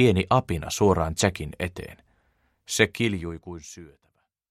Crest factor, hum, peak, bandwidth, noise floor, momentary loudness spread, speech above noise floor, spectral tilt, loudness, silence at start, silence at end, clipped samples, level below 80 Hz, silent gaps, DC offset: 22 dB; none; -4 dBFS; 15.5 kHz; -68 dBFS; 19 LU; 43 dB; -5 dB/octave; -25 LUFS; 0 s; 0.65 s; under 0.1%; -44 dBFS; none; under 0.1%